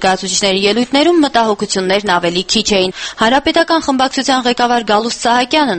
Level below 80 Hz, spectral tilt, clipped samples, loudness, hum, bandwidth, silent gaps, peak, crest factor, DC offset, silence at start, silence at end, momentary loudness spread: -44 dBFS; -3 dB/octave; under 0.1%; -13 LUFS; none; 8.8 kHz; none; 0 dBFS; 12 dB; under 0.1%; 0 s; 0 s; 3 LU